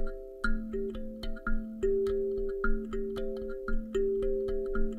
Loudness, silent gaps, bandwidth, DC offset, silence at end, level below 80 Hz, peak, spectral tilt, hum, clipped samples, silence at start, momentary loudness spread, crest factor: -34 LUFS; none; 7.6 kHz; under 0.1%; 0 s; -34 dBFS; -16 dBFS; -7 dB/octave; none; under 0.1%; 0 s; 8 LU; 14 dB